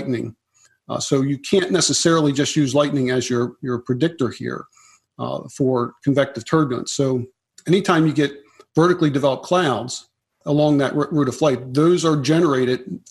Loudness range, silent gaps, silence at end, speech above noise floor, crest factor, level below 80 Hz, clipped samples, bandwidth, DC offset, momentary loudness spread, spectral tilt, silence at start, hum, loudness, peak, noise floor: 4 LU; none; 0.1 s; 37 dB; 20 dB; -60 dBFS; under 0.1%; 12.5 kHz; under 0.1%; 12 LU; -5 dB/octave; 0 s; none; -19 LUFS; 0 dBFS; -55 dBFS